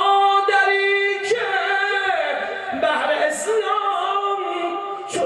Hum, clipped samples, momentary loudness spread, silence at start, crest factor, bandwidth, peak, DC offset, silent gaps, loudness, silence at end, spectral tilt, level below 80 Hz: none; under 0.1%; 9 LU; 0 s; 14 dB; 12.5 kHz; -6 dBFS; under 0.1%; none; -20 LUFS; 0 s; -1.5 dB/octave; -68 dBFS